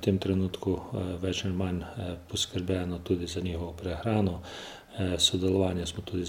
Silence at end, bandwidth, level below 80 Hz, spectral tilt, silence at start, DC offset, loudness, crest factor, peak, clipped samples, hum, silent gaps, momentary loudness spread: 0 s; 16 kHz; -50 dBFS; -5 dB/octave; 0 s; under 0.1%; -30 LUFS; 20 dB; -10 dBFS; under 0.1%; none; none; 11 LU